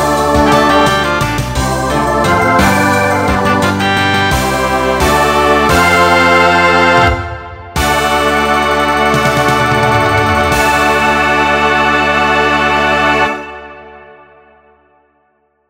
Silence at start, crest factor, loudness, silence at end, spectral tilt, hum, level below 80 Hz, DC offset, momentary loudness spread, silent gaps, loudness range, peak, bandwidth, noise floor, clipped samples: 0 s; 12 dB; -10 LUFS; 1.7 s; -4.5 dB/octave; none; -28 dBFS; under 0.1%; 6 LU; none; 3 LU; 0 dBFS; 16.5 kHz; -58 dBFS; under 0.1%